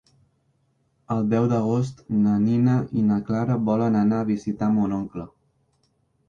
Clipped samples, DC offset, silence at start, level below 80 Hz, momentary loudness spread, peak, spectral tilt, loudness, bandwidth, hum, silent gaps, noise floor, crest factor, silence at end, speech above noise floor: under 0.1%; under 0.1%; 1.1 s; -56 dBFS; 8 LU; -10 dBFS; -9.5 dB/octave; -23 LUFS; 7.2 kHz; none; none; -68 dBFS; 14 dB; 1.05 s; 46 dB